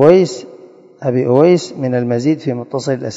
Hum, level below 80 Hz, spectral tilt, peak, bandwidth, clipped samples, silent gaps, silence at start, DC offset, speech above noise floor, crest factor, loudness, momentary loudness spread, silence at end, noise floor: none; -60 dBFS; -7 dB/octave; 0 dBFS; 8 kHz; 0.3%; none; 0 s; under 0.1%; 27 dB; 14 dB; -15 LUFS; 10 LU; 0 s; -40 dBFS